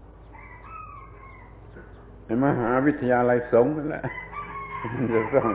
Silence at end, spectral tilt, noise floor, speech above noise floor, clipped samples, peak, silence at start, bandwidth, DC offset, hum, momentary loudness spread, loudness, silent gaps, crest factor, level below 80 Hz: 0 s; -11.5 dB/octave; -45 dBFS; 23 dB; under 0.1%; -6 dBFS; 0 s; 4 kHz; under 0.1%; none; 25 LU; -24 LUFS; none; 18 dB; -48 dBFS